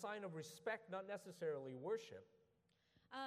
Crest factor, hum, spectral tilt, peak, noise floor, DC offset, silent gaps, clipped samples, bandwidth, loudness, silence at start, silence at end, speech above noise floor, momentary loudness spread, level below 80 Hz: 18 dB; none; -5 dB/octave; -32 dBFS; -81 dBFS; under 0.1%; none; under 0.1%; 15 kHz; -49 LUFS; 0 s; 0 s; 32 dB; 8 LU; under -90 dBFS